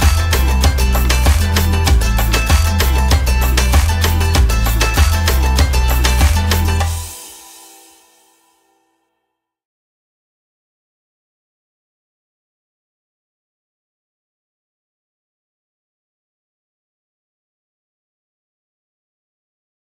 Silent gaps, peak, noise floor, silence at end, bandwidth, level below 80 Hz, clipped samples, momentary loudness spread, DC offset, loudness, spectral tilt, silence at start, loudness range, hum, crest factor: none; 0 dBFS; -74 dBFS; 12.6 s; 16.5 kHz; -18 dBFS; under 0.1%; 3 LU; under 0.1%; -14 LUFS; -4 dB/octave; 0 s; 7 LU; none; 16 dB